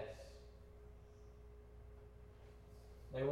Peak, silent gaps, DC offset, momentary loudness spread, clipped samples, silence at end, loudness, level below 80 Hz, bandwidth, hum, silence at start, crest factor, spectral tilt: -28 dBFS; none; under 0.1%; 10 LU; under 0.1%; 0 s; -55 LUFS; -60 dBFS; 16 kHz; none; 0 s; 22 dB; -7 dB/octave